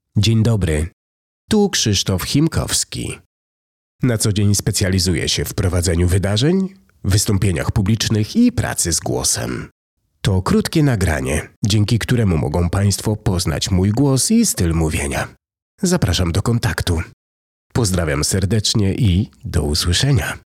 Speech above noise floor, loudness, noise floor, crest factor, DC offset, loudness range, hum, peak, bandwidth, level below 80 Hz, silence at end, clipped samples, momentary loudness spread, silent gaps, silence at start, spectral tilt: over 73 dB; -17 LUFS; under -90 dBFS; 12 dB; under 0.1%; 2 LU; none; -6 dBFS; 16 kHz; -34 dBFS; 0.2 s; under 0.1%; 7 LU; 0.93-1.48 s, 3.26-3.99 s, 9.71-9.97 s, 11.56-11.62 s, 15.62-15.78 s, 17.13-17.70 s; 0.15 s; -4.5 dB/octave